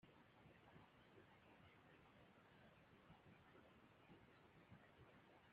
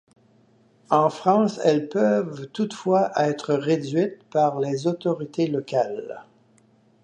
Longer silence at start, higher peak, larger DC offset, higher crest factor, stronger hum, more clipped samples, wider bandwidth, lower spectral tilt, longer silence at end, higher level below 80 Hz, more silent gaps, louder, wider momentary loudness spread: second, 0 s vs 0.9 s; second, -54 dBFS vs -4 dBFS; neither; about the same, 16 dB vs 20 dB; neither; neither; second, 4.9 kHz vs 9.6 kHz; second, -4.5 dB/octave vs -6.5 dB/octave; second, 0 s vs 0.8 s; second, -86 dBFS vs -74 dBFS; neither; second, -69 LUFS vs -23 LUFS; second, 1 LU vs 8 LU